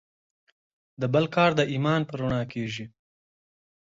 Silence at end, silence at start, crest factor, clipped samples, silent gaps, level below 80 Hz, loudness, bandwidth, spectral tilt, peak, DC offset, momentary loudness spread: 1.1 s; 1 s; 20 dB; under 0.1%; none; -56 dBFS; -26 LUFS; 7.8 kHz; -6.5 dB/octave; -8 dBFS; under 0.1%; 12 LU